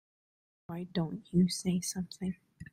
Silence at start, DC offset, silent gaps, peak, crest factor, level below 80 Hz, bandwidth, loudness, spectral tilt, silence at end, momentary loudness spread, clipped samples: 0.7 s; under 0.1%; none; -16 dBFS; 18 dB; -64 dBFS; 16 kHz; -34 LUFS; -5.5 dB/octave; 0.1 s; 14 LU; under 0.1%